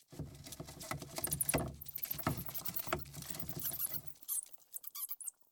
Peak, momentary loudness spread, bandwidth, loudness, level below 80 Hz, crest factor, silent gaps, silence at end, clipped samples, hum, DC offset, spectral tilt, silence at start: -20 dBFS; 13 LU; over 20 kHz; -39 LUFS; -58 dBFS; 22 dB; none; 0.2 s; under 0.1%; none; under 0.1%; -3.5 dB/octave; 0 s